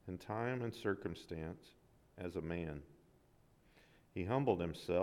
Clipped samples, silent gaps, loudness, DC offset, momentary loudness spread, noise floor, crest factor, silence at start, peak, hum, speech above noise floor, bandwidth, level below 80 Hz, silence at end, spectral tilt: under 0.1%; none; -42 LUFS; under 0.1%; 13 LU; -70 dBFS; 22 dB; 0.05 s; -20 dBFS; none; 29 dB; 17 kHz; -64 dBFS; 0 s; -7.5 dB/octave